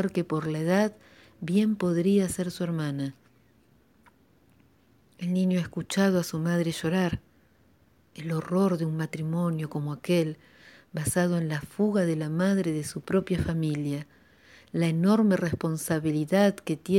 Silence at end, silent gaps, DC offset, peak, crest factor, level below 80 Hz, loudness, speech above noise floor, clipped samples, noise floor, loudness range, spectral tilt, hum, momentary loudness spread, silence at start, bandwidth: 0 s; none; under 0.1%; -10 dBFS; 18 dB; -58 dBFS; -27 LUFS; 36 dB; under 0.1%; -62 dBFS; 4 LU; -6.5 dB/octave; none; 9 LU; 0 s; 16.5 kHz